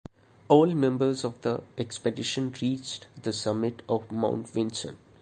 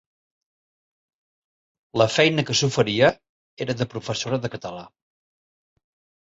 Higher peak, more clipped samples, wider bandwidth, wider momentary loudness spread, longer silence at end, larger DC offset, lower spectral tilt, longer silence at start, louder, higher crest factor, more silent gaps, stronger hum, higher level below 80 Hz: about the same, -6 dBFS vs -4 dBFS; neither; first, 9.8 kHz vs 8 kHz; second, 13 LU vs 16 LU; second, 0.25 s vs 1.35 s; neither; about the same, -5.5 dB/octave vs -4.5 dB/octave; second, 0.5 s vs 1.95 s; second, -28 LUFS vs -22 LUFS; about the same, 22 dB vs 22 dB; second, none vs 3.29-3.57 s; neither; second, -64 dBFS vs -58 dBFS